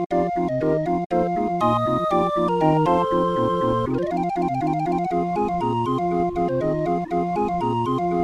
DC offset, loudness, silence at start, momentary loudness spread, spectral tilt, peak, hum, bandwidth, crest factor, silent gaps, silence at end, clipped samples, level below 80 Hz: under 0.1%; -22 LUFS; 0 s; 4 LU; -8 dB/octave; -6 dBFS; none; 11 kHz; 16 dB; 0.06-0.10 s, 1.06-1.10 s; 0 s; under 0.1%; -46 dBFS